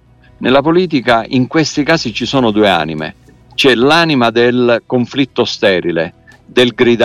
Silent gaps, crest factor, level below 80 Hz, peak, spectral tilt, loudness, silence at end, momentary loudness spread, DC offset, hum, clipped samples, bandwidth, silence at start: none; 12 dB; -44 dBFS; 0 dBFS; -5 dB/octave; -12 LUFS; 0 s; 9 LU; under 0.1%; none; under 0.1%; 13 kHz; 0.4 s